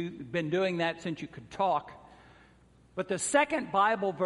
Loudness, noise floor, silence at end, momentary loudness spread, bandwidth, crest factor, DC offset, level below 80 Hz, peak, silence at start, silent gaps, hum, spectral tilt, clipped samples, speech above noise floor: -30 LUFS; -60 dBFS; 0 s; 14 LU; 11.5 kHz; 20 dB; under 0.1%; -66 dBFS; -12 dBFS; 0 s; none; none; -4 dB/octave; under 0.1%; 30 dB